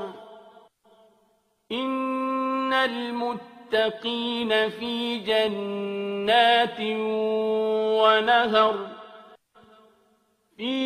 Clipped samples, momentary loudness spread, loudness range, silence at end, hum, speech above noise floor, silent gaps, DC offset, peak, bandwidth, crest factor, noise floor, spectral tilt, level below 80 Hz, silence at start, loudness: under 0.1%; 12 LU; 6 LU; 0 s; none; 43 dB; none; under 0.1%; -6 dBFS; 14 kHz; 20 dB; -67 dBFS; -4.5 dB/octave; -70 dBFS; 0 s; -24 LUFS